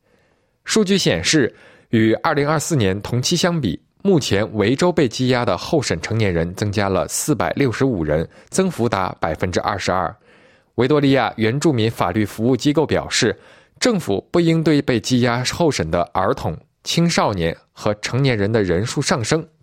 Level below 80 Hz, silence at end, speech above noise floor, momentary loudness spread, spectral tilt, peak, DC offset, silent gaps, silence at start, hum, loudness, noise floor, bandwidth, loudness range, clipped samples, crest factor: -46 dBFS; 0.15 s; 43 dB; 6 LU; -5 dB/octave; -2 dBFS; under 0.1%; none; 0.65 s; none; -19 LUFS; -61 dBFS; 16.5 kHz; 2 LU; under 0.1%; 16 dB